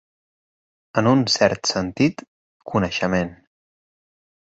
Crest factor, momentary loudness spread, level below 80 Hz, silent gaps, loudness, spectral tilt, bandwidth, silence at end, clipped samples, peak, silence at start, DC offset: 22 dB; 9 LU; -50 dBFS; 2.28-2.60 s; -21 LUFS; -4.5 dB/octave; 8 kHz; 1.05 s; under 0.1%; -2 dBFS; 0.95 s; under 0.1%